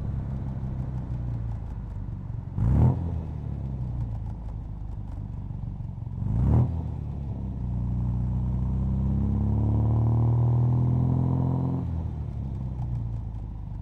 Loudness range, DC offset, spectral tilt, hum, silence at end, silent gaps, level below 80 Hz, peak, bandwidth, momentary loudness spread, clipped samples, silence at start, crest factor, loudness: 5 LU; under 0.1%; -11.5 dB/octave; none; 0 s; none; -34 dBFS; -10 dBFS; 2.7 kHz; 13 LU; under 0.1%; 0 s; 16 dB; -28 LUFS